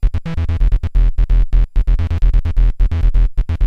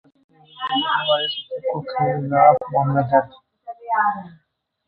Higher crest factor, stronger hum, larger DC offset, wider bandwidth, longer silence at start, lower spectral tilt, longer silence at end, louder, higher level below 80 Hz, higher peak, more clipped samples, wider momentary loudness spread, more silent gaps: second, 10 dB vs 20 dB; neither; neither; second, 4.3 kHz vs 5.2 kHz; second, 0 s vs 0.55 s; about the same, -8.5 dB/octave vs -8.5 dB/octave; second, 0 s vs 0.6 s; about the same, -18 LUFS vs -20 LUFS; first, -14 dBFS vs -60 dBFS; about the same, -2 dBFS vs 0 dBFS; neither; second, 2 LU vs 17 LU; neither